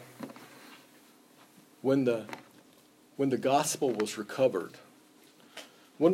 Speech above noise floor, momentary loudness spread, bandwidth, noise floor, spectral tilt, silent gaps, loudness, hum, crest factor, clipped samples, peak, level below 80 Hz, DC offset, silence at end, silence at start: 31 dB; 23 LU; 16 kHz; -60 dBFS; -5 dB/octave; none; -30 LUFS; none; 20 dB; under 0.1%; -12 dBFS; -84 dBFS; under 0.1%; 0 s; 0 s